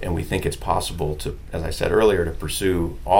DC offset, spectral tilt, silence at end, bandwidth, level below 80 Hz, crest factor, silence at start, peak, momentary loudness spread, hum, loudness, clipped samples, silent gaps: 0.4%; -5 dB/octave; 0 s; 17 kHz; -32 dBFS; 18 dB; 0 s; -2 dBFS; 11 LU; none; -23 LUFS; under 0.1%; none